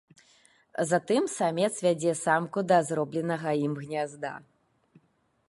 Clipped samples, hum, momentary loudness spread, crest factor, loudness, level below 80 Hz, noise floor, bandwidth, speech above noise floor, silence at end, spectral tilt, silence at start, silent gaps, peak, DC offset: under 0.1%; none; 10 LU; 20 dB; -28 LUFS; -76 dBFS; -70 dBFS; 11.5 kHz; 43 dB; 1.05 s; -5 dB/octave; 0.8 s; none; -10 dBFS; under 0.1%